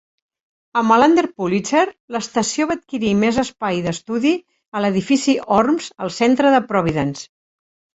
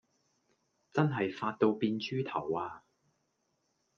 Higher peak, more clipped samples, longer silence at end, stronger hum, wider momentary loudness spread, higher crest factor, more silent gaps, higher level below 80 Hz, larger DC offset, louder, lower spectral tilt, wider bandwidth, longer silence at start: first, -2 dBFS vs -12 dBFS; neither; second, 0.7 s vs 1.2 s; neither; about the same, 9 LU vs 7 LU; second, 16 dB vs 22 dB; first, 2.00-2.08 s, 4.68-4.72 s vs none; first, -52 dBFS vs -78 dBFS; neither; first, -18 LUFS vs -33 LUFS; second, -5 dB/octave vs -7.5 dB/octave; first, 8.2 kHz vs 7 kHz; second, 0.75 s vs 0.95 s